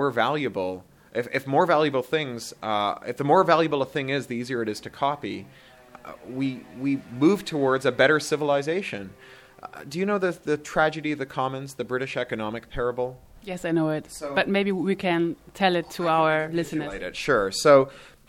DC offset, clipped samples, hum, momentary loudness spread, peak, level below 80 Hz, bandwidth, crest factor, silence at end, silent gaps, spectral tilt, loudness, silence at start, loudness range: under 0.1%; under 0.1%; none; 13 LU; -4 dBFS; -54 dBFS; 17 kHz; 20 dB; 0.2 s; none; -5 dB/octave; -25 LUFS; 0 s; 5 LU